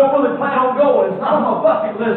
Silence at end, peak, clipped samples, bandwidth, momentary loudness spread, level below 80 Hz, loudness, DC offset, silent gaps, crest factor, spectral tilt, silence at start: 0 s; -4 dBFS; under 0.1%; 4.3 kHz; 3 LU; -64 dBFS; -15 LUFS; under 0.1%; none; 12 dB; -10 dB/octave; 0 s